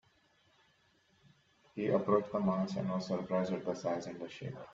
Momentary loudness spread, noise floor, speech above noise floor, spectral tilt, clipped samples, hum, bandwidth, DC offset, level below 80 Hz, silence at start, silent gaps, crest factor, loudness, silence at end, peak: 13 LU; -71 dBFS; 36 dB; -7.5 dB/octave; under 0.1%; none; 7.6 kHz; under 0.1%; -74 dBFS; 1.75 s; none; 22 dB; -35 LUFS; 0 s; -16 dBFS